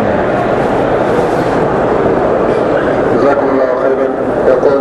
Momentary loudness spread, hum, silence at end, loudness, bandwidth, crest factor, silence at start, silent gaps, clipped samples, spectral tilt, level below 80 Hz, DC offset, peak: 2 LU; none; 0 s; -12 LUFS; 11.5 kHz; 10 dB; 0 s; none; under 0.1%; -7.5 dB/octave; -34 dBFS; under 0.1%; 0 dBFS